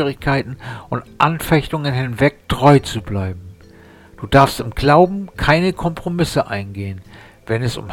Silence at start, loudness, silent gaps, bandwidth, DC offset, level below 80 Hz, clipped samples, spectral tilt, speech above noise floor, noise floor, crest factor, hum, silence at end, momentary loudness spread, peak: 0 s; -17 LUFS; none; 17 kHz; under 0.1%; -36 dBFS; under 0.1%; -6.5 dB/octave; 26 dB; -43 dBFS; 18 dB; none; 0 s; 15 LU; 0 dBFS